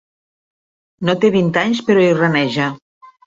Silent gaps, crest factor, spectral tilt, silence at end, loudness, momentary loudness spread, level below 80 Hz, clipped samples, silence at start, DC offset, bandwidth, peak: 2.82-3.01 s; 16 dB; -6.5 dB/octave; 0.2 s; -15 LUFS; 7 LU; -58 dBFS; under 0.1%; 1 s; under 0.1%; 7.8 kHz; 0 dBFS